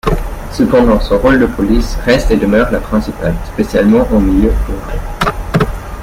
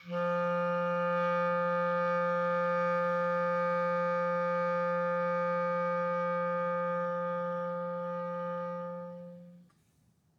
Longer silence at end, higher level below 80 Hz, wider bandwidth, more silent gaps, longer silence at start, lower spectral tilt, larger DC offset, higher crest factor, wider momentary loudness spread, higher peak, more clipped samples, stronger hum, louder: second, 0 s vs 0.8 s; first, -20 dBFS vs -84 dBFS; first, 16 kHz vs 6.6 kHz; neither; about the same, 0.05 s vs 0 s; second, -6.5 dB/octave vs -8 dB/octave; neither; about the same, 12 dB vs 12 dB; about the same, 9 LU vs 7 LU; first, 0 dBFS vs -20 dBFS; neither; neither; first, -13 LUFS vs -31 LUFS